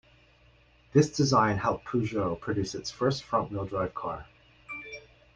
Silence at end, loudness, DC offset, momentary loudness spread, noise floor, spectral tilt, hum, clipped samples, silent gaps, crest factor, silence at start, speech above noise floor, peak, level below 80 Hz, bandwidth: 0.35 s; -29 LUFS; under 0.1%; 17 LU; -60 dBFS; -6 dB/octave; none; under 0.1%; none; 20 dB; 0.95 s; 33 dB; -8 dBFS; -56 dBFS; 9.8 kHz